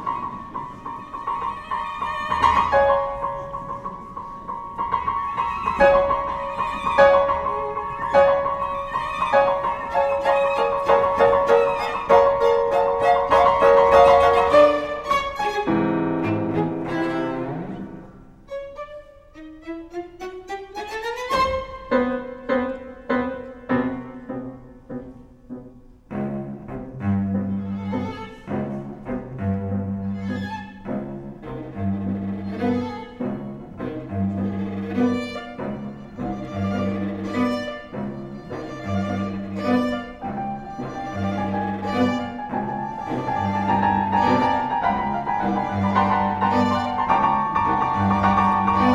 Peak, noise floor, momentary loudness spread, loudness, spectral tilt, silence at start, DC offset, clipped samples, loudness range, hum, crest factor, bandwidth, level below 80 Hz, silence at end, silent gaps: -2 dBFS; -45 dBFS; 17 LU; -22 LUFS; -7 dB/octave; 0 s; under 0.1%; under 0.1%; 12 LU; none; 20 dB; 11.5 kHz; -46 dBFS; 0 s; none